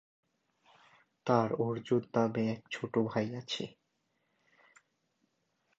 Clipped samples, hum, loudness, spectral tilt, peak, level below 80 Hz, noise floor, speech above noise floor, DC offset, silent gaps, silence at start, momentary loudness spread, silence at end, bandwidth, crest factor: under 0.1%; none; -33 LUFS; -6.5 dB/octave; -12 dBFS; -76 dBFS; -79 dBFS; 47 dB; under 0.1%; none; 1.25 s; 9 LU; 2.1 s; 8 kHz; 24 dB